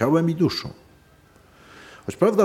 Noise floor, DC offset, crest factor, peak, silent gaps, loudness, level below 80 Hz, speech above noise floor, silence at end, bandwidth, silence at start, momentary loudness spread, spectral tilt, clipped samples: -54 dBFS; under 0.1%; 20 dB; -4 dBFS; none; -23 LUFS; -56 dBFS; 34 dB; 0 s; 15 kHz; 0 s; 23 LU; -7 dB/octave; under 0.1%